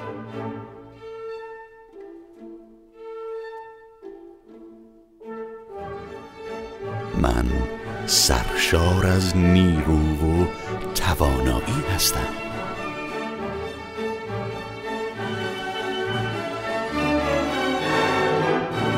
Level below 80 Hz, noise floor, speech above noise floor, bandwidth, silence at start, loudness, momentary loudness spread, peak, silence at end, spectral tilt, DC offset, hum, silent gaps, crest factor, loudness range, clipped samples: -34 dBFS; -49 dBFS; 29 dB; 16 kHz; 0 s; -23 LUFS; 22 LU; -4 dBFS; 0 s; -4.5 dB/octave; under 0.1%; none; none; 22 dB; 19 LU; under 0.1%